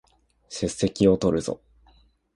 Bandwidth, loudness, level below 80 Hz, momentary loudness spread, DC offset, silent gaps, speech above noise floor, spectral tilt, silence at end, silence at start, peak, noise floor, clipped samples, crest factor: 11.5 kHz; -24 LUFS; -48 dBFS; 17 LU; under 0.1%; none; 36 dB; -6 dB/octave; 0.8 s; 0.5 s; -6 dBFS; -59 dBFS; under 0.1%; 20 dB